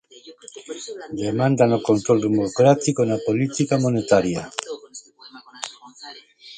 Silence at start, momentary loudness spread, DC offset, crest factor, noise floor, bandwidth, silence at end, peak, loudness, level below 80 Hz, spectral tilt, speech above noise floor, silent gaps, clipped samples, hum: 0.25 s; 23 LU; under 0.1%; 20 dB; -46 dBFS; 9.6 kHz; 0 s; -2 dBFS; -20 LUFS; -58 dBFS; -6 dB/octave; 26 dB; none; under 0.1%; none